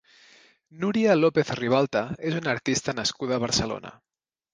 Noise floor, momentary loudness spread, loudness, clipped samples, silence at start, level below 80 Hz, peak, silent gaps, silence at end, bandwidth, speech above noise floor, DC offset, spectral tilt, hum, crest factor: -56 dBFS; 10 LU; -25 LUFS; under 0.1%; 0.75 s; -56 dBFS; -6 dBFS; none; 0.65 s; 10 kHz; 31 dB; under 0.1%; -4.5 dB/octave; none; 20 dB